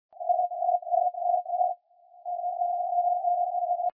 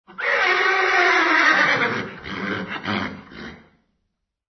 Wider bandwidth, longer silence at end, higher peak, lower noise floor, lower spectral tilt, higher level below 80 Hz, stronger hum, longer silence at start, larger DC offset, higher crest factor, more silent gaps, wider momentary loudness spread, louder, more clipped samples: second, 1 kHz vs 6.4 kHz; second, 0.05 s vs 1 s; second, -14 dBFS vs -4 dBFS; second, -56 dBFS vs -76 dBFS; first, -5.5 dB/octave vs -3.5 dB/octave; second, under -90 dBFS vs -58 dBFS; neither; about the same, 0.2 s vs 0.1 s; neither; about the same, 14 dB vs 18 dB; neither; second, 7 LU vs 19 LU; second, -28 LUFS vs -18 LUFS; neither